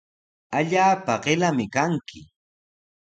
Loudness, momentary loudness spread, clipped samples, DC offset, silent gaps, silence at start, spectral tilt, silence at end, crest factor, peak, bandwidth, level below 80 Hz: -22 LUFS; 10 LU; under 0.1%; under 0.1%; none; 0.5 s; -5 dB/octave; 0.9 s; 20 dB; -6 dBFS; 9 kHz; -62 dBFS